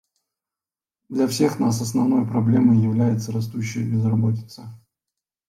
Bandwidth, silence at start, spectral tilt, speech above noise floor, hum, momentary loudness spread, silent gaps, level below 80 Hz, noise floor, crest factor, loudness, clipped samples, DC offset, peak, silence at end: 15 kHz; 1.1 s; -7 dB/octave; over 70 dB; none; 11 LU; none; -62 dBFS; under -90 dBFS; 16 dB; -21 LUFS; under 0.1%; under 0.1%; -6 dBFS; 0.75 s